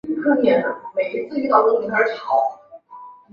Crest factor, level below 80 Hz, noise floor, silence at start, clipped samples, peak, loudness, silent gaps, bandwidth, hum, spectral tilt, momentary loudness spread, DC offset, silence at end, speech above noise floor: 18 dB; -64 dBFS; -42 dBFS; 0.05 s; under 0.1%; -2 dBFS; -19 LUFS; none; 6.8 kHz; none; -7 dB/octave; 8 LU; under 0.1%; 0.2 s; 23 dB